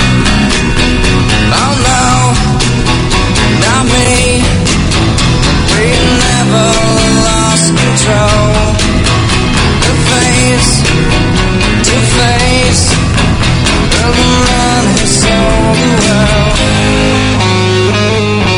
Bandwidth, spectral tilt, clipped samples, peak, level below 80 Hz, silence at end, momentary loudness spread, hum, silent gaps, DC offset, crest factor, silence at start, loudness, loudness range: 11 kHz; -4 dB/octave; 0.3%; 0 dBFS; -16 dBFS; 0 s; 2 LU; none; none; under 0.1%; 8 dB; 0 s; -8 LUFS; 1 LU